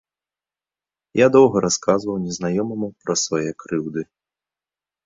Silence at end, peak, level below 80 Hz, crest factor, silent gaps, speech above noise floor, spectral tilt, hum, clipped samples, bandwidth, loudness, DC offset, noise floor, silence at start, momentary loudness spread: 1 s; -2 dBFS; -58 dBFS; 20 dB; none; over 71 dB; -4.5 dB/octave; none; under 0.1%; 7.8 kHz; -20 LUFS; under 0.1%; under -90 dBFS; 1.15 s; 13 LU